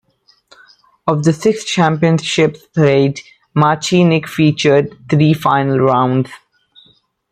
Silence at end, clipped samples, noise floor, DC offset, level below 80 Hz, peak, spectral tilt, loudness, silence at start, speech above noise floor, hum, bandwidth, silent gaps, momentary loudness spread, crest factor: 0.95 s; under 0.1%; -55 dBFS; under 0.1%; -54 dBFS; 0 dBFS; -6 dB/octave; -14 LUFS; 1.05 s; 41 dB; none; 14.5 kHz; none; 6 LU; 14 dB